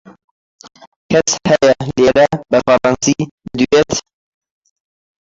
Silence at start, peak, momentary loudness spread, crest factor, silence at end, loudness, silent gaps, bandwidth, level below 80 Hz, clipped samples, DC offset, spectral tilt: 1.1 s; 0 dBFS; 7 LU; 14 dB; 1.25 s; -14 LUFS; 3.31-3.38 s; 8 kHz; -46 dBFS; under 0.1%; under 0.1%; -4 dB/octave